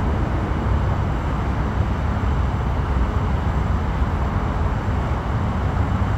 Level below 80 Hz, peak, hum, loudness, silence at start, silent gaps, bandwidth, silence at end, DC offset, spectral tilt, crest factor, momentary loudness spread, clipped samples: -24 dBFS; -8 dBFS; none; -22 LUFS; 0 s; none; 8 kHz; 0 s; under 0.1%; -8 dB/octave; 12 dB; 1 LU; under 0.1%